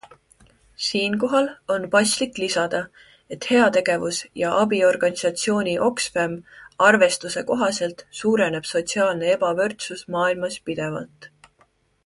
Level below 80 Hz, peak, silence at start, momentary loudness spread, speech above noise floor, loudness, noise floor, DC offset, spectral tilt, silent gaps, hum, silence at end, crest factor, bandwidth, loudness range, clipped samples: -62 dBFS; -2 dBFS; 0.8 s; 10 LU; 40 dB; -21 LUFS; -62 dBFS; under 0.1%; -3.5 dB/octave; none; none; 0.8 s; 20 dB; 11.5 kHz; 3 LU; under 0.1%